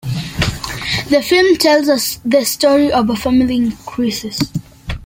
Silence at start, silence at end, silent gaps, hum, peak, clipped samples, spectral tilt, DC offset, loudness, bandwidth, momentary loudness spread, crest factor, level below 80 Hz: 0.05 s; 0 s; none; none; 0 dBFS; under 0.1%; -4.5 dB/octave; under 0.1%; -15 LUFS; 17 kHz; 10 LU; 14 dB; -36 dBFS